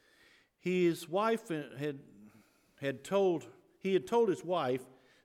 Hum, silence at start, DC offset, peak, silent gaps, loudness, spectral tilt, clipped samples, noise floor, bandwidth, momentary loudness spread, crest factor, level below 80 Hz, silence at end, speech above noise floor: none; 0.65 s; under 0.1%; -18 dBFS; none; -34 LUFS; -6 dB/octave; under 0.1%; -66 dBFS; 15.5 kHz; 10 LU; 16 dB; -80 dBFS; 0.4 s; 33 dB